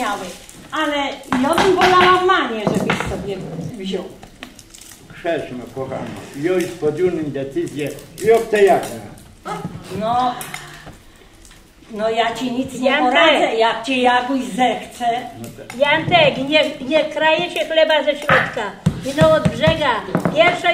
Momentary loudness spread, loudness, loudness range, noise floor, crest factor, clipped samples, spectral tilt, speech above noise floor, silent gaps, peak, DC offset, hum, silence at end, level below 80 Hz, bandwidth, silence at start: 16 LU; -17 LUFS; 9 LU; -44 dBFS; 18 dB; under 0.1%; -4.5 dB/octave; 27 dB; none; 0 dBFS; under 0.1%; none; 0 s; -46 dBFS; 16 kHz; 0 s